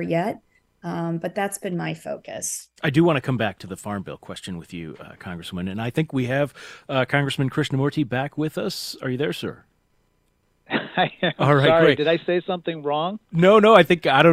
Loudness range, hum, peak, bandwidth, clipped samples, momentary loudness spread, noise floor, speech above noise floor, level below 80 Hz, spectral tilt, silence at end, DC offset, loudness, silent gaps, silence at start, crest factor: 9 LU; none; 0 dBFS; 15.5 kHz; under 0.1%; 18 LU; -66 dBFS; 45 dB; -58 dBFS; -5.5 dB/octave; 0 s; under 0.1%; -22 LUFS; none; 0 s; 22 dB